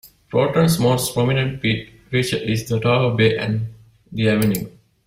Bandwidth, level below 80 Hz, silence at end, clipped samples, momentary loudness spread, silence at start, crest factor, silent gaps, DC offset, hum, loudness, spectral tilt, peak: 16 kHz; -48 dBFS; 0.35 s; under 0.1%; 10 LU; 0.05 s; 16 dB; none; under 0.1%; none; -19 LUFS; -5.5 dB/octave; -4 dBFS